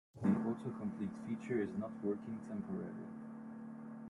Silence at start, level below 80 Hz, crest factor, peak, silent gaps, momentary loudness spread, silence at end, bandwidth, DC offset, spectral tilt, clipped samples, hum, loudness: 0.15 s; -76 dBFS; 20 dB; -22 dBFS; none; 14 LU; 0 s; 11 kHz; under 0.1%; -9 dB/octave; under 0.1%; none; -42 LUFS